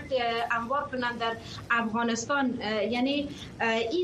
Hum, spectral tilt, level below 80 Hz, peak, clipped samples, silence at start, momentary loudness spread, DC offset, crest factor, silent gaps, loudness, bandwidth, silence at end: none; -4 dB/octave; -58 dBFS; -14 dBFS; under 0.1%; 0 s; 5 LU; under 0.1%; 16 dB; none; -29 LUFS; 12.5 kHz; 0 s